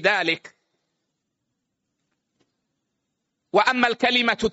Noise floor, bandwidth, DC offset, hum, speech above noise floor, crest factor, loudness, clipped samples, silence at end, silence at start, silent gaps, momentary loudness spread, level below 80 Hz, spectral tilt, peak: -79 dBFS; 8 kHz; under 0.1%; none; 58 dB; 22 dB; -21 LUFS; under 0.1%; 0 s; 0 s; none; 6 LU; -58 dBFS; -0.5 dB/octave; -4 dBFS